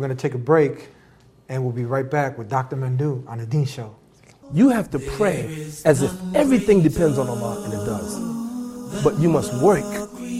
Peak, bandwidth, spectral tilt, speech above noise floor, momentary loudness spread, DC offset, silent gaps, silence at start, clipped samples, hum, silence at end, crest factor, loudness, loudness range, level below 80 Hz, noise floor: -2 dBFS; 16 kHz; -7 dB/octave; 32 dB; 12 LU; under 0.1%; none; 0 s; under 0.1%; none; 0 s; 18 dB; -21 LUFS; 6 LU; -48 dBFS; -52 dBFS